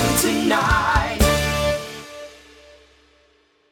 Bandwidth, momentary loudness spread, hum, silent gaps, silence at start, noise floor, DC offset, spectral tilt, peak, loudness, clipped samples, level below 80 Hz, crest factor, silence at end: 19 kHz; 19 LU; none; none; 0 s; -59 dBFS; under 0.1%; -4 dB/octave; -2 dBFS; -19 LUFS; under 0.1%; -30 dBFS; 18 dB; 1.4 s